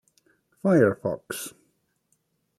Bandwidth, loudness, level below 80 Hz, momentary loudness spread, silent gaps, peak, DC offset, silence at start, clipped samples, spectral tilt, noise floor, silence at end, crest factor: 14 kHz; -25 LUFS; -68 dBFS; 15 LU; none; -6 dBFS; under 0.1%; 0.65 s; under 0.1%; -6.5 dB/octave; -72 dBFS; 1.1 s; 22 dB